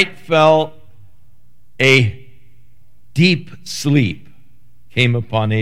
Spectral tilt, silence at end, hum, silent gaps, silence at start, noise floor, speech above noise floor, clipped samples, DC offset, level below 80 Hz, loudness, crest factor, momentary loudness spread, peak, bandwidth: -5.5 dB/octave; 0 s; none; none; 0 s; -55 dBFS; 41 dB; under 0.1%; 2%; -54 dBFS; -15 LUFS; 18 dB; 13 LU; 0 dBFS; 15.5 kHz